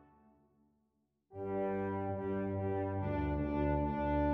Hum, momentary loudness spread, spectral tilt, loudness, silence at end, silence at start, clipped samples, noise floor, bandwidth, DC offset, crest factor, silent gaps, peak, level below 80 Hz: none; 4 LU; -11 dB/octave; -37 LUFS; 0 s; 1.3 s; under 0.1%; -80 dBFS; 5.2 kHz; under 0.1%; 14 dB; none; -24 dBFS; -46 dBFS